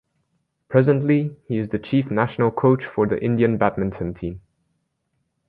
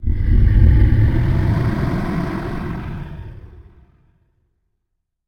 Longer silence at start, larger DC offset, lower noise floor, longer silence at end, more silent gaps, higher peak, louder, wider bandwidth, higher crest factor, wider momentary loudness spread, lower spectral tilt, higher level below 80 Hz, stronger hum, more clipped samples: first, 0.7 s vs 0 s; neither; about the same, -73 dBFS vs -74 dBFS; second, 1.1 s vs 1.65 s; neither; about the same, -2 dBFS vs -2 dBFS; second, -21 LUFS vs -18 LUFS; second, 4.5 kHz vs 6 kHz; about the same, 20 dB vs 16 dB; second, 9 LU vs 17 LU; first, -11 dB/octave vs -9.5 dB/octave; second, -50 dBFS vs -20 dBFS; neither; neither